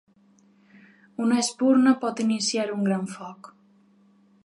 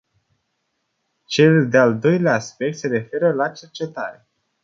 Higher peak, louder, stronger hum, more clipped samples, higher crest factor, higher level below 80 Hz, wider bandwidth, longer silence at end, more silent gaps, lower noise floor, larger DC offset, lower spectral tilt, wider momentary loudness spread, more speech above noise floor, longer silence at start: second, -8 dBFS vs -2 dBFS; second, -23 LUFS vs -18 LUFS; neither; neither; about the same, 18 dB vs 18 dB; second, -80 dBFS vs -64 dBFS; first, 11.5 kHz vs 7.6 kHz; first, 1 s vs 0.5 s; neither; second, -59 dBFS vs -73 dBFS; neither; second, -4.5 dB/octave vs -6.5 dB/octave; first, 18 LU vs 15 LU; second, 36 dB vs 55 dB; about the same, 1.2 s vs 1.3 s